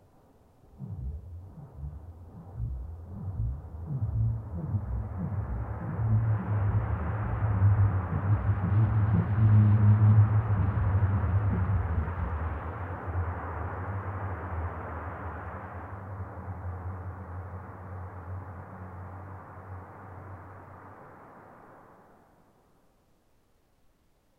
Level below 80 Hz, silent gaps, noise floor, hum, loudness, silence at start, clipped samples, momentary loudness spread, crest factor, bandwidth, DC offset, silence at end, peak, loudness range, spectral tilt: -40 dBFS; none; -67 dBFS; none; -29 LUFS; 0.75 s; under 0.1%; 21 LU; 18 dB; 3 kHz; under 0.1%; 2.6 s; -12 dBFS; 20 LU; -11 dB/octave